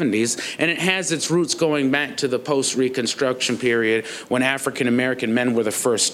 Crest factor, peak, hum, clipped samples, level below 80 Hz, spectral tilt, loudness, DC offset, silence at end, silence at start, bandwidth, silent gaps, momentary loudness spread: 18 dB; -2 dBFS; none; under 0.1%; -70 dBFS; -3.5 dB/octave; -20 LUFS; under 0.1%; 0 s; 0 s; 16 kHz; none; 3 LU